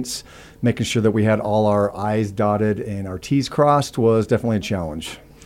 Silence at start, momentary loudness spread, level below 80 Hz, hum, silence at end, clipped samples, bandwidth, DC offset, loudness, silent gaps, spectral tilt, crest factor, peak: 0 s; 11 LU; -48 dBFS; none; 0.25 s; under 0.1%; 16 kHz; under 0.1%; -20 LUFS; none; -6 dB/octave; 16 dB; -4 dBFS